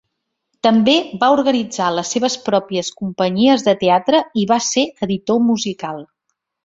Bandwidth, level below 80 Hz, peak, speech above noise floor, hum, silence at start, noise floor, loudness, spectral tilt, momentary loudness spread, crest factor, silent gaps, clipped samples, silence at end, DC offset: 7.8 kHz; -58 dBFS; -2 dBFS; 59 dB; none; 0.65 s; -75 dBFS; -16 LUFS; -4 dB/octave; 9 LU; 16 dB; none; under 0.1%; 0.6 s; under 0.1%